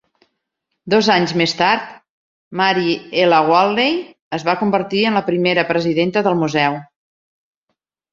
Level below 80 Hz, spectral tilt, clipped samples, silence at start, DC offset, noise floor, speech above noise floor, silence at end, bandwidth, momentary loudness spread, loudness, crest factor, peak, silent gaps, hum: -60 dBFS; -5.5 dB/octave; under 0.1%; 0.85 s; under 0.1%; -76 dBFS; 60 dB; 1.3 s; 7.6 kHz; 7 LU; -16 LUFS; 16 dB; -2 dBFS; 2.09-2.51 s, 4.22-4.31 s; none